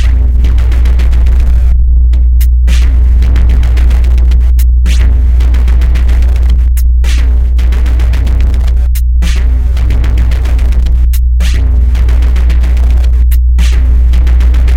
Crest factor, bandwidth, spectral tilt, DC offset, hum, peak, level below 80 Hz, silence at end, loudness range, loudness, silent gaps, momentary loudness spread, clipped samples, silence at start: 6 dB; 14.5 kHz; -6.5 dB/octave; under 0.1%; none; 0 dBFS; -6 dBFS; 0 s; 2 LU; -10 LUFS; none; 2 LU; under 0.1%; 0 s